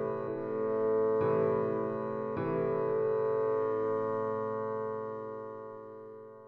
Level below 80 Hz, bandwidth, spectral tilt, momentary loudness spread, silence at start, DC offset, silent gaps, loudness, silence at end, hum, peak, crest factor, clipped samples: -70 dBFS; 4.2 kHz; -10 dB/octave; 15 LU; 0 s; under 0.1%; none; -32 LUFS; 0 s; none; -18 dBFS; 14 dB; under 0.1%